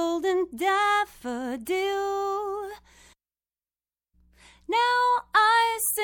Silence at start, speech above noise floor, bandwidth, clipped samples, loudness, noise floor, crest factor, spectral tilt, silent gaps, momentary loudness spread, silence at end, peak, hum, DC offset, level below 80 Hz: 0 s; over 65 dB; 17.5 kHz; under 0.1%; -25 LUFS; under -90 dBFS; 18 dB; -1 dB/octave; none; 12 LU; 0 s; -10 dBFS; none; under 0.1%; -62 dBFS